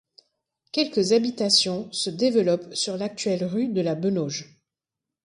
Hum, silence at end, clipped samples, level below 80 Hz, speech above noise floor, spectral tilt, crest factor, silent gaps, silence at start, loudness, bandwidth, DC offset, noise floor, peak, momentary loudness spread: none; 0.8 s; under 0.1%; -68 dBFS; 64 dB; -4 dB/octave; 20 dB; none; 0.75 s; -24 LUFS; 11.5 kHz; under 0.1%; -87 dBFS; -6 dBFS; 9 LU